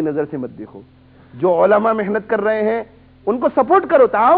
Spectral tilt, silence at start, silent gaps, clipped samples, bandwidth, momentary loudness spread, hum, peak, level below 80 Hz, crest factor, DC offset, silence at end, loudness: -10.5 dB/octave; 0 s; none; under 0.1%; 4.7 kHz; 16 LU; none; -2 dBFS; -56 dBFS; 14 dB; under 0.1%; 0 s; -16 LUFS